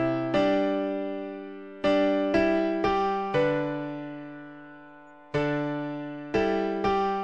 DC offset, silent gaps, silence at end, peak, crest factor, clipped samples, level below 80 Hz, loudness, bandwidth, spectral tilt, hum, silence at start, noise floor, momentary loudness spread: 0.1%; none; 0 s; -10 dBFS; 16 dB; under 0.1%; -54 dBFS; -27 LUFS; 8.2 kHz; -7 dB/octave; none; 0 s; -50 dBFS; 16 LU